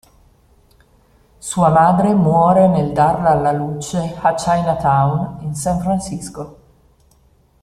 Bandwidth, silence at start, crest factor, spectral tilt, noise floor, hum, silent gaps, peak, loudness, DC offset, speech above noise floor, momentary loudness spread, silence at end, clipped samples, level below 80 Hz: 14 kHz; 1.45 s; 16 dB; -7 dB/octave; -54 dBFS; none; none; -2 dBFS; -16 LUFS; under 0.1%; 39 dB; 14 LU; 1.1 s; under 0.1%; -42 dBFS